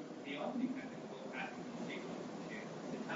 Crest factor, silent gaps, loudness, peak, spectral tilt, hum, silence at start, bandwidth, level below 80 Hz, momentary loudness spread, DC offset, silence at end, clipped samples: 16 dB; none; -45 LUFS; -28 dBFS; -4.5 dB/octave; none; 0 s; 7.4 kHz; -86 dBFS; 6 LU; under 0.1%; 0 s; under 0.1%